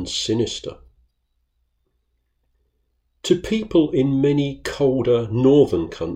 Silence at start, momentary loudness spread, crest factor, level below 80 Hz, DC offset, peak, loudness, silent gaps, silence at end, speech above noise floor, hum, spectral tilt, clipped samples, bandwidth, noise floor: 0 s; 10 LU; 18 dB; -48 dBFS; under 0.1%; -4 dBFS; -19 LUFS; none; 0 s; 51 dB; none; -6 dB/octave; under 0.1%; 15 kHz; -70 dBFS